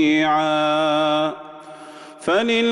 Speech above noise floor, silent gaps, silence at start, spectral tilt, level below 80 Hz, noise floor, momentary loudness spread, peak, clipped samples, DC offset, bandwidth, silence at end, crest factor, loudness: 21 dB; none; 0 s; -4.5 dB/octave; -62 dBFS; -39 dBFS; 21 LU; -8 dBFS; under 0.1%; under 0.1%; 11 kHz; 0 s; 12 dB; -19 LUFS